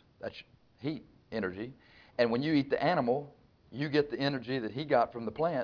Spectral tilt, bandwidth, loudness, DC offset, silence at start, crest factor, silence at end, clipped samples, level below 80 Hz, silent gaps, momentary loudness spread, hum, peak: -4.5 dB/octave; 5.4 kHz; -32 LUFS; under 0.1%; 0.2 s; 20 dB; 0 s; under 0.1%; -66 dBFS; none; 15 LU; none; -14 dBFS